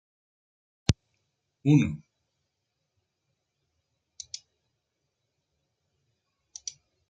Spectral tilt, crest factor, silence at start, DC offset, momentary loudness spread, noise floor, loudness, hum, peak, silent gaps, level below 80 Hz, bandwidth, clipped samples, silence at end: -6 dB/octave; 32 dB; 0.9 s; under 0.1%; 20 LU; -81 dBFS; -27 LUFS; none; -2 dBFS; none; -54 dBFS; 8.8 kHz; under 0.1%; 5.15 s